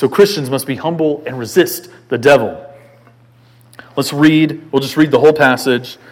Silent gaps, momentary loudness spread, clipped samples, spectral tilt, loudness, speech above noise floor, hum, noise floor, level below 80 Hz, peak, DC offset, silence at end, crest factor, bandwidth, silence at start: none; 12 LU; 0.3%; -5.5 dB/octave; -14 LUFS; 33 dB; none; -47 dBFS; -58 dBFS; 0 dBFS; under 0.1%; 0.2 s; 14 dB; 17 kHz; 0 s